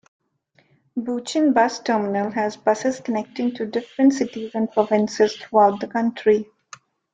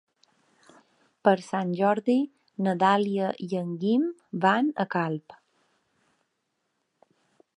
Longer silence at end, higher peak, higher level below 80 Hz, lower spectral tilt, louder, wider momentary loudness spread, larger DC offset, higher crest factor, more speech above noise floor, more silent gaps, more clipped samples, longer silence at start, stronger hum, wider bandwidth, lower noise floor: second, 0.7 s vs 2.25 s; about the same, -4 dBFS vs -6 dBFS; first, -66 dBFS vs -80 dBFS; second, -5 dB/octave vs -7 dB/octave; first, -21 LUFS vs -26 LUFS; about the same, 9 LU vs 9 LU; neither; about the same, 18 dB vs 22 dB; second, 42 dB vs 53 dB; neither; neither; second, 0.95 s vs 1.25 s; neither; second, 9.4 kHz vs 10.5 kHz; second, -63 dBFS vs -78 dBFS